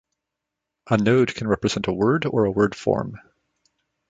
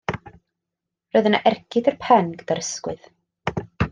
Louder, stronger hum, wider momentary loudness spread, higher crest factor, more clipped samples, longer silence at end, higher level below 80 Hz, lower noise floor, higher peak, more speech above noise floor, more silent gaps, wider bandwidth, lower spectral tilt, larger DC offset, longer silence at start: about the same, -21 LUFS vs -22 LUFS; neither; second, 5 LU vs 14 LU; about the same, 20 dB vs 20 dB; neither; first, 0.95 s vs 0 s; about the same, -52 dBFS vs -48 dBFS; about the same, -83 dBFS vs -84 dBFS; about the same, -4 dBFS vs -2 dBFS; about the same, 63 dB vs 64 dB; neither; second, 9 kHz vs 10 kHz; first, -6.5 dB/octave vs -5 dB/octave; neither; first, 0.85 s vs 0.1 s